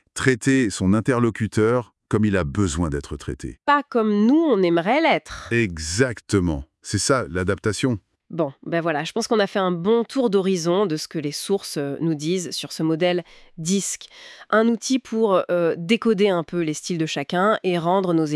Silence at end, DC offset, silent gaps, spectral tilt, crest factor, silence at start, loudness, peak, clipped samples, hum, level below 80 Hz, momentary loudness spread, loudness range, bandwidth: 0 s; under 0.1%; none; -5 dB/octave; 20 dB; 0.15 s; -22 LUFS; -2 dBFS; under 0.1%; none; -48 dBFS; 8 LU; 3 LU; 12 kHz